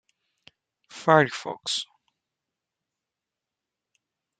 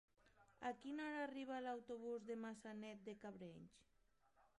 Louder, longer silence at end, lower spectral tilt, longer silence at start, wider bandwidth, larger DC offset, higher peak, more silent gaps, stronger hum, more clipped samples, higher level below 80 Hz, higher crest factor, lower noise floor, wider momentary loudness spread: first, -24 LUFS vs -51 LUFS; first, 2.55 s vs 0.15 s; second, -4 dB/octave vs -5.5 dB/octave; first, 0.95 s vs 0.25 s; second, 9.4 kHz vs 11 kHz; neither; first, -2 dBFS vs -36 dBFS; neither; neither; neither; first, -76 dBFS vs -84 dBFS; first, 28 dB vs 18 dB; first, -87 dBFS vs -80 dBFS; first, 13 LU vs 9 LU